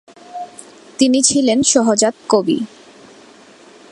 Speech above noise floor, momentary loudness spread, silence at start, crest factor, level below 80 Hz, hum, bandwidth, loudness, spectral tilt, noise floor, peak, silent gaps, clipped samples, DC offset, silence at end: 29 dB; 20 LU; 0.3 s; 18 dB; -58 dBFS; none; 11.5 kHz; -14 LUFS; -3 dB/octave; -43 dBFS; 0 dBFS; none; under 0.1%; under 0.1%; 1.25 s